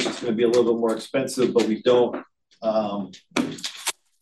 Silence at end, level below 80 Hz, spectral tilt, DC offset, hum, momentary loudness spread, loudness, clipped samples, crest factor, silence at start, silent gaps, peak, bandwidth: 0.3 s; -70 dBFS; -4.5 dB/octave; under 0.1%; none; 10 LU; -23 LUFS; under 0.1%; 18 dB; 0 s; none; -4 dBFS; 12.5 kHz